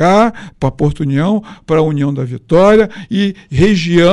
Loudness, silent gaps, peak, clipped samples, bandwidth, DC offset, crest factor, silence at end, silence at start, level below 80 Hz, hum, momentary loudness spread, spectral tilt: -13 LUFS; none; -2 dBFS; under 0.1%; 11 kHz; under 0.1%; 10 dB; 0 s; 0 s; -34 dBFS; none; 9 LU; -7 dB/octave